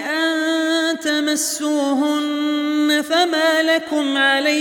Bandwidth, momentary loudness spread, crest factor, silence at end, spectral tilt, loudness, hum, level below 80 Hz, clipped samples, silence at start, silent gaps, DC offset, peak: 17.5 kHz; 4 LU; 14 dB; 0 s; -0.5 dB/octave; -18 LUFS; none; -72 dBFS; under 0.1%; 0 s; none; under 0.1%; -4 dBFS